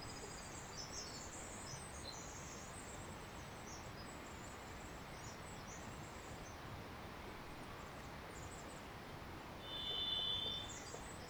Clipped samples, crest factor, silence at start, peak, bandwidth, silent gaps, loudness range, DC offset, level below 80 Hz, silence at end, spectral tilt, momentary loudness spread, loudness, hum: under 0.1%; 20 dB; 0 s; -30 dBFS; over 20 kHz; none; 8 LU; under 0.1%; -62 dBFS; 0 s; -2.5 dB/octave; 11 LU; -48 LUFS; none